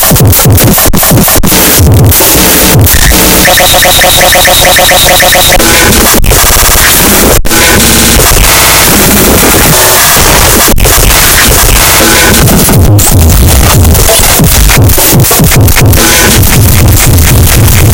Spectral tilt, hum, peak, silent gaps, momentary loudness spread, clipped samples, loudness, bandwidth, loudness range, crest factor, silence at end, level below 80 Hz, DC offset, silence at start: -3 dB/octave; none; 0 dBFS; none; 2 LU; 20%; -2 LUFS; over 20 kHz; 1 LU; 2 dB; 0 s; -10 dBFS; under 0.1%; 0 s